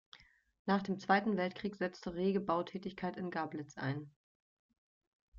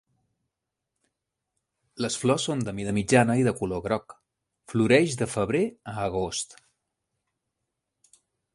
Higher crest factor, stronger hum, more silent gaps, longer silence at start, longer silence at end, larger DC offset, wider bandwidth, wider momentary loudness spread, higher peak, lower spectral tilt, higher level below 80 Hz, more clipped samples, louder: about the same, 22 dB vs 24 dB; neither; first, 0.59-0.65 s, 4.16-4.69 s, 4.78-5.01 s, 5.07-5.32 s vs none; second, 0.15 s vs 1.95 s; second, 0 s vs 2.1 s; neither; second, 7.4 kHz vs 11.5 kHz; about the same, 11 LU vs 11 LU; second, -16 dBFS vs -4 dBFS; about the same, -5 dB/octave vs -5 dB/octave; second, -72 dBFS vs -56 dBFS; neither; second, -37 LUFS vs -26 LUFS